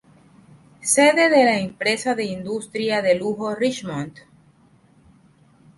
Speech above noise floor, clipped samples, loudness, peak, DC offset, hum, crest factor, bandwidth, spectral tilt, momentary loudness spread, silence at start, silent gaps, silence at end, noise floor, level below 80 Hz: 35 dB; under 0.1%; -20 LUFS; -4 dBFS; under 0.1%; none; 18 dB; 12 kHz; -3.5 dB/octave; 14 LU; 0.8 s; none; 1.65 s; -55 dBFS; -62 dBFS